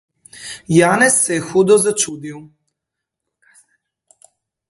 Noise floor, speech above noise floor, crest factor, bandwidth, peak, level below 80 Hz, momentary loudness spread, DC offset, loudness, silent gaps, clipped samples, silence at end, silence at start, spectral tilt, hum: -81 dBFS; 66 dB; 18 dB; 12 kHz; 0 dBFS; -60 dBFS; 20 LU; under 0.1%; -14 LUFS; none; under 0.1%; 2.25 s; 0.35 s; -4 dB/octave; none